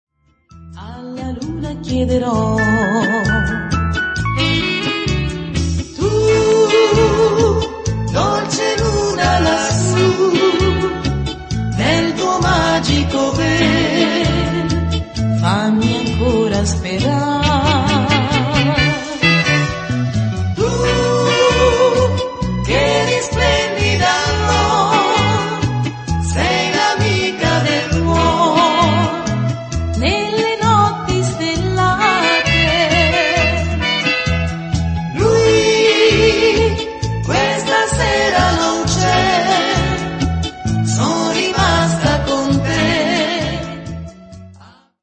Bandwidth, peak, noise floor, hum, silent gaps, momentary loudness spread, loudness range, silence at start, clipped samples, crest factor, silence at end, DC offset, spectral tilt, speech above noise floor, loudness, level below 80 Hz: 8.8 kHz; 0 dBFS; -47 dBFS; none; none; 8 LU; 3 LU; 0.55 s; under 0.1%; 14 dB; 0.4 s; under 0.1%; -5 dB/octave; 31 dB; -15 LUFS; -28 dBFS